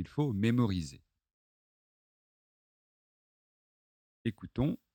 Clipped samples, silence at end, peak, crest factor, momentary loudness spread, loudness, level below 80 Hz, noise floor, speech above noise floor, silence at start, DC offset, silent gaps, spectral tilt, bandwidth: under 0.1%; 0.2 s; -16 dBFS; 22 dB; 11 LU; -33 LUFS; -58 dBFS; under -90 dBFS; over 58 dB; 0 s; under 0.1%; 1.33-4.25 s; -7.5 dB/octave; 17 kHz